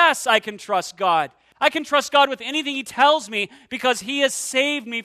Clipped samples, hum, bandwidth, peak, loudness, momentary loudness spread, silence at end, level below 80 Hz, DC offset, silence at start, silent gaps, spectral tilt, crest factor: under 0.1%; none; 14 kHz; -2 dBFS; -20 LUFS; 8 LU; 0 s; -68 dBFS; under 0.1%; 0 s; none; -1.5 dB/octave; 20 dB